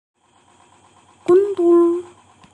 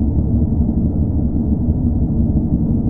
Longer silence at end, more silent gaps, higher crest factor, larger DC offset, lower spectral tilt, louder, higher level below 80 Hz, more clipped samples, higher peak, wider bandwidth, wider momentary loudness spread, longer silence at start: first, 0.5 s vs 0 s; neither; about the same, 14 dB vs 12 dB; neither; second, -7 dB/octave vs -14.5 dB/octave; about the same, -16 LUFS vs -17 LUFS; second, -70 dBFS vs -20 dBFS; neither; second, -6 dBFS vs -2 dBFS; first, 8.8 kHz vs 1.5 kHz; first, 12 LU vs 1 LU; first, 1.3 s vs 0 s